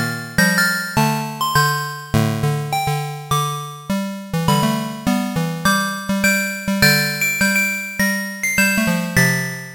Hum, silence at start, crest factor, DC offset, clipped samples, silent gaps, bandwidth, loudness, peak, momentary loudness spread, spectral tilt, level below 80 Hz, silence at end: none; 0 s; 18 dB; under 0.1%; under 0.1%; none; 17 kHz; -18 LUFS; 0 dBFS; 7 LU; -4 dB/octave; -44 dBFS; 0 s